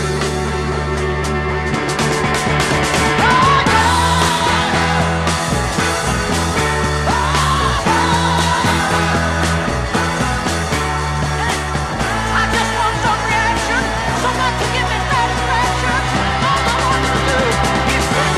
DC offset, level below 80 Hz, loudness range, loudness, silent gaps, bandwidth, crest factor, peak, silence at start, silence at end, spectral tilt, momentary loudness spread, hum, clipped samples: 0.2%; -26 dBFS; 3 LU; -15 LUFS; none; 14.5 kHz; 14 dB; -2 dBFS; 0 s; 0 s; -4 dB/octave; 5 LU; none; under 0.1%